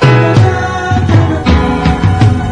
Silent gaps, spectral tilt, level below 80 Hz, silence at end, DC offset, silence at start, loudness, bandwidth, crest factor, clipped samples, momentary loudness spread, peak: none; -7 dB/octave; -22 dBFS; 0 s; under 0.1%; 0 s; -10 LUFS; 9.6 kHz; 8 dB; 0.2%; 5 LU; 0 dBFS